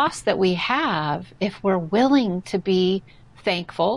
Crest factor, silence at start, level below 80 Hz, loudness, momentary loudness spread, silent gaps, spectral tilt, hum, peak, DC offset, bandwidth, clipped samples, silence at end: 14 dB; 0 s; -56 dBFS; -22 LUFS; 8 LU; none; -5.5 dB/octave; none; -8 dBFS; 0.2%; 11.5 kHz; under 0.1%; 0 s